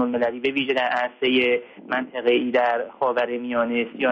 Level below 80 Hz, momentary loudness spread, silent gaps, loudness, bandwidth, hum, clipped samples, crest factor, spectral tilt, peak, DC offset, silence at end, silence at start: -66 dBFS; 5 LU; none; -22 LUFS; 7 kHz; none; under 0.1%; 14 dB; -6 dB/octave; -8 dBFS; under 0.1%; 0 s; 0 s